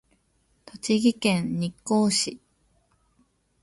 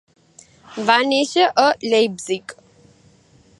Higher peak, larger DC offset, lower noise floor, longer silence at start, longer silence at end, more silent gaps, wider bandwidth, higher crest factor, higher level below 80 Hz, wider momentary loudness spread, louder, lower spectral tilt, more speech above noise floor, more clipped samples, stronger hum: second, -10 dBFS vs 0 dBFS; neither; first, -68 dBFS vs -53 dBFS; about the same, 0.75 s vs 0.7 s; first, 1.25 s vs 1.05 s; neither; about the same, 11.5 kHz vs 11.5 kHz; about the same, 18 dB vs 20 dB; about the same, -62 dBFS vs -66 dBFS; second, 9 LU vs 12 LU; second, -24 LUFS vs -18 LUFS; first, -4.5 dB/octave vs -3 dB/octave; first, 44 dB vs 35 dB; neither; neither